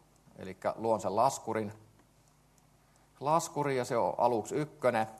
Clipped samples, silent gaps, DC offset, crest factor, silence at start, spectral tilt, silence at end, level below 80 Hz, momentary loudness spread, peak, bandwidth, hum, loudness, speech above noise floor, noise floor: under 0.1%; none; under 0.1%; 20 dB; 0.4 s; -5 dB/octave; 0 s; -72 dBFS; 9 LU; -14 dBFS; 13 kHz; none; -32 LUFS; 34 dB; -65 dBFS